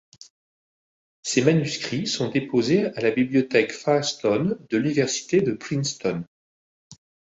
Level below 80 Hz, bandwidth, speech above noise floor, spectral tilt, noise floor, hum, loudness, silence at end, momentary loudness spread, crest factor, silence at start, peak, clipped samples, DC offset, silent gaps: -62 dBFS; 8.2 kHz; over 68 dB; -5 dB/octave; under -90 dBFS; none; -23 LUFS; 0.35 s; 6 LU; 20 dB; 1.25 s; -4 dBFS; under 0.1%; under 0.1%; 6.27-6.90 s